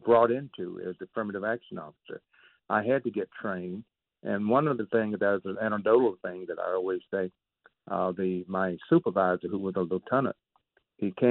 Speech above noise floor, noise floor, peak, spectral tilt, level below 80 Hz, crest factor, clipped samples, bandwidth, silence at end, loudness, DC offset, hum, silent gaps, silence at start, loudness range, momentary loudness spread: 43 dB; -71 dBFS; -10 dBFS; -6 dB/octave; -72 dBFS; 18 dB; under 0.1%; 4.2 kHz; 0 s; -29 LUFS; under 0.1%; none; none; 0.05 s; 5 LU; 14 LU